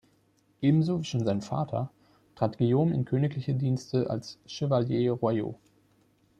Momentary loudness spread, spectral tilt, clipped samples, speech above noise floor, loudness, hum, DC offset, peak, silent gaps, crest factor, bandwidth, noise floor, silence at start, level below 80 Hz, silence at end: 9 LU; -8 dB/octave; under 0.1%; 40 dB; -28 LUFS; none; under 0.1%; -10 dBFS; none; 20 dB; 9.2 kHz; -67 dBFS; 0.6 s; -64 dBFS; 0.85 s